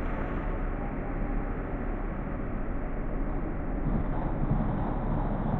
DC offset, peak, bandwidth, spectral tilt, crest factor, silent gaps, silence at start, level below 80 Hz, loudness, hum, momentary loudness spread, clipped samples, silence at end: under 0.1%; -16 dBFS; 3.7 kHz; -11.5 dB/octave; 14 dB; none; 0 s; -32 dBFS; -33 LUFS; none; 5 LU; under 0.1%; 0 s